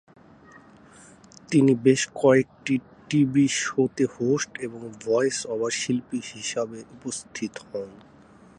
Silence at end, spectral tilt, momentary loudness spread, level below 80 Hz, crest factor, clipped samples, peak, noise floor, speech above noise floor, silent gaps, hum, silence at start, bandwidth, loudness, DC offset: 0.6 s; -5 dB/octave; 15 LU; -64 dBFS; 20 dB; under 0.1%; -6 dBFS; -52 dBFS; 28 dB; none; none; 1.5 s; 11 kHz; -24 LUFS; under 0.1%